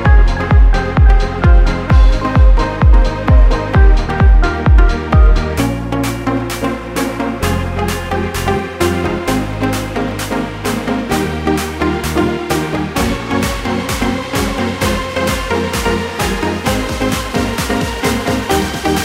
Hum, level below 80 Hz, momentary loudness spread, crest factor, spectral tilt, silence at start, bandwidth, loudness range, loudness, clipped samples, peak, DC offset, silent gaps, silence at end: none; -14 dBFS; 7 LU; 12 dB; -5.5 dB/octave; 0 s; 16 kHz; 6 LU; -15 LUFS; under 0.1%; 0 dBFS; under 0.1%; none; 0 s